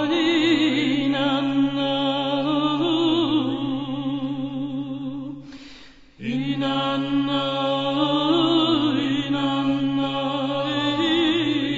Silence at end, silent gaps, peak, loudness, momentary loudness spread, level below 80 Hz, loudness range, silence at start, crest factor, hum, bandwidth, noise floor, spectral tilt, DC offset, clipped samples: 0 s; none; -8 dBFS; -22 LUFS; 10 LU; -56 dBFS; 6 LU; 0 s; 14 dB; none; 7.8 kHz; -46 dBFS; -6 dB/octave; under 0.1%; under 0.1%